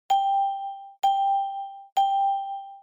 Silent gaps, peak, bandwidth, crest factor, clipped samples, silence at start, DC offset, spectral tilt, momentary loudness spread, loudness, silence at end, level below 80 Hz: 1.92-1.96 s; -14 dBFS; 16 kHz; 12 dB; under 0.1%; 0.1 s; under 0.1%; 1 dB/octave; 12 LU; -25 LUFS; 0.05 s; -76 dBFS